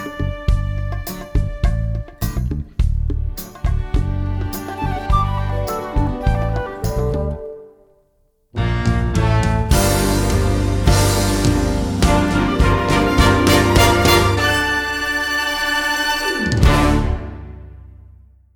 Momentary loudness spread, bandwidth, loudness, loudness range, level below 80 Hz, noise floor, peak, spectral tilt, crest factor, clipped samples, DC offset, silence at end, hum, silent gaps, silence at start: 11 LU; over 20 kHz; -18 LUFS; 8 LU; -22 dBFS; -60 dBFS; 0 dBFS; -5 dB/octave; 16 dB; under 0.1%; under 0.1%; 0.55 s; none; none; 0 s